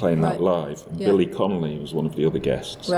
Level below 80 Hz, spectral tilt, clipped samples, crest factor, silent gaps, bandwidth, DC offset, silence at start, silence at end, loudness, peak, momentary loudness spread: -50 dBFS; -7 dB/octave; under 0.1%; 16 dB; none; 14 kHz; under 0.1%; 0 s; 0 s; -23 LUFS; -8 dBFS; 7 LU